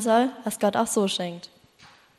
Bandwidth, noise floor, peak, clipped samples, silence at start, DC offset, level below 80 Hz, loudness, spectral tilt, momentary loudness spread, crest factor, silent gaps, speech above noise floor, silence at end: 13 kHz; -54 dBFS; -10 dBFS; under 0.1%; 0 s; under 0.1%; -68 dBFS; -25 LUFS; -4 dB/octave; 10 LU; 16 dB; none; 30 dB; 0.75 s